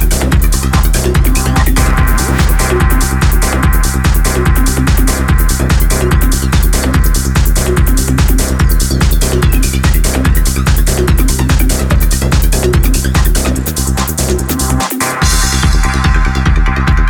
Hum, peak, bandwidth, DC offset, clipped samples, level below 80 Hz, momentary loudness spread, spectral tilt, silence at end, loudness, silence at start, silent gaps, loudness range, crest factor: none; 0 dBFS; over 20 kHz; under 0.1%; under 0.1%; -12 dBFS; 1 LU; -4.5 dB/octave; 0 s; -12 LUFS; 0 s; none; 1 LU; 10 dB